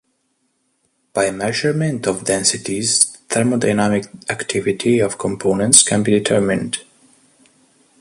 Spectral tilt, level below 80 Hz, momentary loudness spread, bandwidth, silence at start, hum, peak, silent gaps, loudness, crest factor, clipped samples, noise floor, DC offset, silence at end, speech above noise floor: -3.5 dB/octave; -52 dBFS; 11 LU; 16 kHz; 1.15 s; none; 0 dBFS; none; -17 LUFS; 18 dB; under 0.1%; -67 dBFS; under 0.1%; 1.2 s; 50 dB